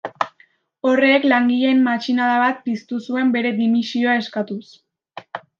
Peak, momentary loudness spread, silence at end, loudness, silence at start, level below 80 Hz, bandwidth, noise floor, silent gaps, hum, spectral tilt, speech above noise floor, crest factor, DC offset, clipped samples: -2 dBFS; 12 LU; 0.2 s; -18 LUFS; 0.05 s; -74 dBFS; 7.2 kHz; -57 dBFS; none; none; -5.5 dB/octave; 39 dB; 16 dB; under 0.1%; under 0.1%